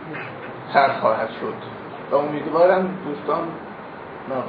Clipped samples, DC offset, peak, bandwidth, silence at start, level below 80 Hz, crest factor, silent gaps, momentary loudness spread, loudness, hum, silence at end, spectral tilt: under 0.1%; under 0.1%; -2 dBFS; 5 kHz; 0 s; -64 dBFS; 20 dB; none; 17 LU; -22 LUFS; none; 0 s; -9 dB/octave